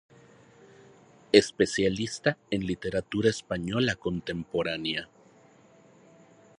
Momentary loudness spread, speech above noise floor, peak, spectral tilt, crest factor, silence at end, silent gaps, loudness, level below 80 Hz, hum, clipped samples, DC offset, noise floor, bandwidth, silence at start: 10 LU; 30 dB; -2 dBFS; -4.5 dB/octave; 28 dB; 1.55 s; none; -28 LUFS; -56 dBFS; none; under 0.1%; under 0.1%; -57 dBFS; 11 kHz; 1.35 s